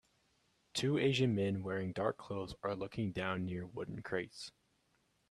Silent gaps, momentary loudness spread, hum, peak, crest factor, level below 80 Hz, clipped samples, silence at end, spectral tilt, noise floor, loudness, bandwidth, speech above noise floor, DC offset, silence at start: none; 12 LU; none; -20 dBFS; 20 dB; -68 dBFS; under 0.1%; 0.8 s; -6 dB/octave; -77 dBFS; -38 LUFS; 13.5 kHz; 40 dB; under 0.1%; 0.75 s